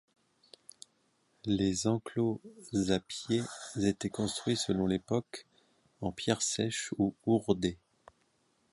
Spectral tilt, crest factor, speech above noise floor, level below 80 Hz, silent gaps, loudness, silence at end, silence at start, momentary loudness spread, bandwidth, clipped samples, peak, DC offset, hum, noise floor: -5 dB/octave; 22 dB; 41 dB; -60 dBFS; none; -33 LUFS; 0.95 s; 1.45 s; 12 LU; 11.5 kHz; under 0.1%; -12 dBFS; under 0.1%; none; -73 dBFS